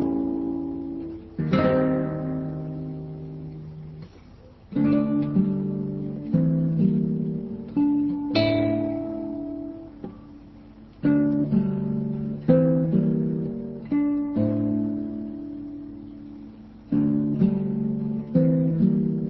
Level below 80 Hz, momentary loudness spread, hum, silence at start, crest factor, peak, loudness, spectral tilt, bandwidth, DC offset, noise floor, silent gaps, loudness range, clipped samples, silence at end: -50 dBFS; 17 LU; none; 0 s; 20 dB; -6 dBFS; -25 LUFS; -10.5 dB/octave; 5.8 kHz; under 0.1%; -48 dBFS; none; 4 LU; under 0.1%; 0 s